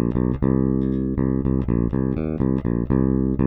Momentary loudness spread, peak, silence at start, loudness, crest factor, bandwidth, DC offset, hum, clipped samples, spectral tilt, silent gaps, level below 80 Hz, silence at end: 3 LU; -6 dBFS; 0 s; -22 LUFS; 14 dB; 3.8 kHz; under 0.1%; none; under 0.1%; -13 dB/octave; none; -30 dBFS; 0 s